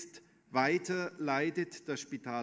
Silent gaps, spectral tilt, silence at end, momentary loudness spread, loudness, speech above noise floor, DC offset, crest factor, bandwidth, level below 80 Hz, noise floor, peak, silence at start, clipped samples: none; -5 dB/octave; 0 s; 9 LU; -34 LUFS; 22 dB; under 0.1%; 22 dB; 8 kHz; -82 dBFS; -56 dBFS; -14 dBFS; 0 s; under 0.1%